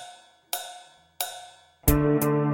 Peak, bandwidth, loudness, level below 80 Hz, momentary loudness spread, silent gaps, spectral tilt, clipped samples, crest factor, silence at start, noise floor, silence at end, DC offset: -4 dBFS; 17 kHz; -26 LUFS; -36 dBFS; 21 LU; none; -5.5 dB/octave; under 0.1%; 24 dB; 0 s; -49 dBFS; 0 s; under 0.1%